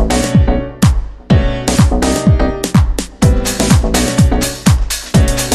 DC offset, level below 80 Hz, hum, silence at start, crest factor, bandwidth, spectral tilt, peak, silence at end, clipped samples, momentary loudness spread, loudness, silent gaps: under 0.1%; -16 dBFS; none; 0 s; 12 dB; 15.5 kHz; -5.5 dB/octave; 0 dBFS; 0 s; under 0.1%; 3 LU; -13 LUFS; none